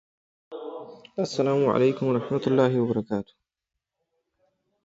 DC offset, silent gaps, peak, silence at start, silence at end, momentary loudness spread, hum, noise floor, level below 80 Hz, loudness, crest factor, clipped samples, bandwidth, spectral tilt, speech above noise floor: under 0.1%; none; -8 dBFS; 0.5 s; 1.65 s; 18 LU; none; -86 dBFS; -66 dBFS; -24 LUFS; 20 dB; under 0.1%; 8 kHz; -7 dB/octave; 62 dB